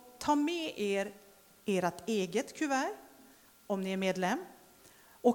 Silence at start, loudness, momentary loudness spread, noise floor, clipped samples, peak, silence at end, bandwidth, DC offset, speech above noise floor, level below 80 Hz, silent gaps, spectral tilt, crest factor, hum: 0.05 s; -34 LUFS; 8 LU; -60 dBFS; under 0.1%; -14 dBFS; 0 s; 19 kHz; under 0.1%; 27 dB; -72 dBFS; none; -5 dB/octave; 20 dB; none